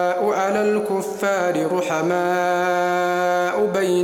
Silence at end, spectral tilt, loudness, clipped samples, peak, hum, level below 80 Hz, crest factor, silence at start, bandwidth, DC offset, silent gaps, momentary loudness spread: 0 s; -5 dB/octave; -20 LUFS; under 0.1%; -8 dBFS; none; -66 dBFS; 12 dB; 0 s; 17 kHz; under 0.1%; none; 2 LU